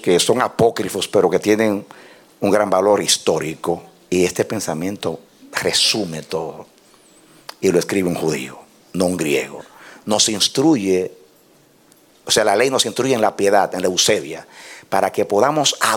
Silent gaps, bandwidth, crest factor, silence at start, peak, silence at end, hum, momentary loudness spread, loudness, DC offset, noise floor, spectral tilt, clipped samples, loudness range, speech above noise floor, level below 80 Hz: none; 18 kHz; 18 dB; 0 s; -2 dBFS; 0 s; none; 15 LU; -18 LUFS; under 0.1%; -52 dBFS; -3 dB/octave; under 0.1%; 4 LU; 35 dB; -58 dBFS